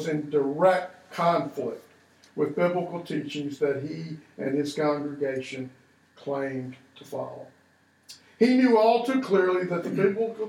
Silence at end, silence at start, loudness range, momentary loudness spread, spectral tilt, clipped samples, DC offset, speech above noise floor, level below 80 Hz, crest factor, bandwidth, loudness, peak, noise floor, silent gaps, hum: 0 s; 0 s; 8 LU; 17 LU; -6.5 dB/octave; under 0.1%; under 0.1%; 37 dB; -80 dBFS; 20 dB; 14.5 kHz; -26 LUFS; -8 dBFS; -62 dBFS; none; none